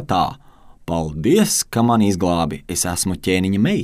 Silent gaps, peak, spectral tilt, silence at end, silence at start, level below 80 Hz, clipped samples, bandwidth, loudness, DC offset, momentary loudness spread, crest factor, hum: none; -2 dBFS; -4.5 dB/octave; 0 s; 0 s; -42 dBFS; under 0.1%; 16 kHz; -18 LUFS; under 0.1%; 8 LU; 16 dB; none